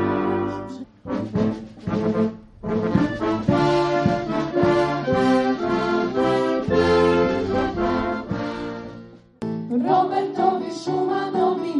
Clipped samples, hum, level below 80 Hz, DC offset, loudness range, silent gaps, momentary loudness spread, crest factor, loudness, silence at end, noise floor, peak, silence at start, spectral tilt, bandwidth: under 0.1%; none; -46 dBFS; under 0.1%; 4 LU; none; 11 LU; 16 dB; -22 LUFS; 0 s; -42 dBFS; -4 dBFS; 0 s; -7 dB/octave; 10.5 kHz